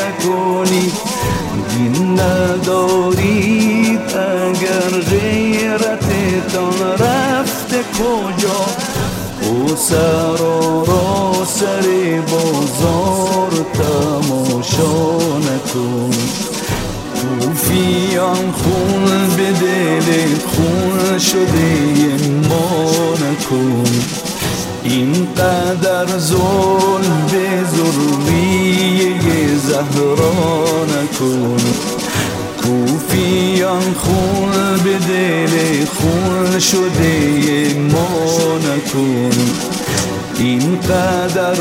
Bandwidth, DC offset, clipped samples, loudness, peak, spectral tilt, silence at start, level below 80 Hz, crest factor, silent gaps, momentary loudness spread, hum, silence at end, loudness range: 16 kHz; under 0.1%; under 0.1%; -14 LUFS; 0 dBFS; -5 dB/octave; 0 s; -42 dBFS; 14 dB; none; 5 LU; none; 0 s; 2 LU